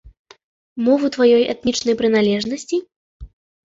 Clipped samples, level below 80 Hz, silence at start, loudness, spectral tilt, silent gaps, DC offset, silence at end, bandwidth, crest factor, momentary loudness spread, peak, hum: under 0.1%; -48 dBFS; 0.05 s; -18 LUFS; -4.5 dB/octave; 0.19-0.25 s, 0.43-0.76 s, 2.96-3.20 s; under 0.1%; 0.45 s; 8 kHz; 16 dB; 10 LU; -4 dBFS; none